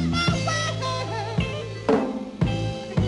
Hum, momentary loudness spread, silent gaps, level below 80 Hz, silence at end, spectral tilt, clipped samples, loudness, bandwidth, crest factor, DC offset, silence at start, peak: none; 6 LU; none; -40 dBFS; 0 s; -5.5 dB/octave; under 0.1%; -25 LUFS; 11.5 kHz; 16 dB; under 0.1%; 0 s; -8 dBFS